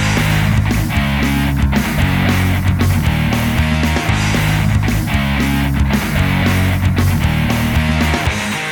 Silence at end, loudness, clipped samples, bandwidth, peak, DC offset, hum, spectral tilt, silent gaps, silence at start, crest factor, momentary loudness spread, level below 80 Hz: 0 s; -15 LUFS; under 0.1%; over 20 kHz; -2 dBFS; under 0.1%; none; -5.5 dB/octave; none; 0 s; 12 dB; 2 LU; -22 dBFS